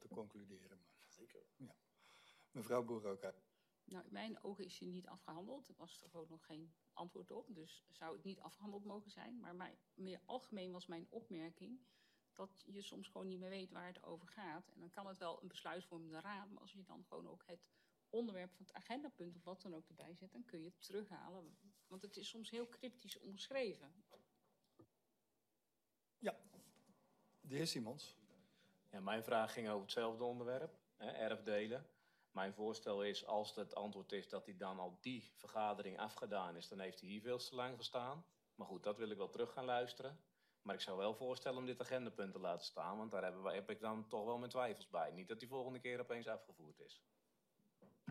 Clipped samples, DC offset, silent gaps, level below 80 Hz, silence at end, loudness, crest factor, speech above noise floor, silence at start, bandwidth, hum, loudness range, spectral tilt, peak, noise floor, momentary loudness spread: under 0.1%; under 0.1%; none; under -90 dBFS; 0 s; -49 LUFS; 22 dB; 41 dB; 0 s; 15 kHz; none; 9 LU; -4.5 dB/octave; -28 dBFS; -90 dBFS; 17 LU